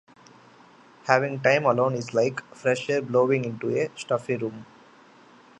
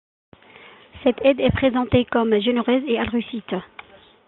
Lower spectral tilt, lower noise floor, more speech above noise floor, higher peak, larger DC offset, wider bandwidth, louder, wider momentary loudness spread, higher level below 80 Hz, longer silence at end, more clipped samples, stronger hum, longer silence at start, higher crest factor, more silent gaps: second, -6 dB/octave vs -10 dB/octave; first, -53 dBFS vs -47 dBFS; about the same, 29 dB vs 27 dB; about the same, -2 dBFS vs -4 dBFS; neither; first, 9.2 kHz vs 4.2 kHz; second, -25 LUFS vs -21 LUFS; about the same, 9 LU vs 11 LU; second, -70 dBFS vs -46 dBFS; first, 0.95 s vs 0.6 s; neither; neither; about the same, 1.05 s vs 0.95 s; first, 24 dB vs 18 dB; neither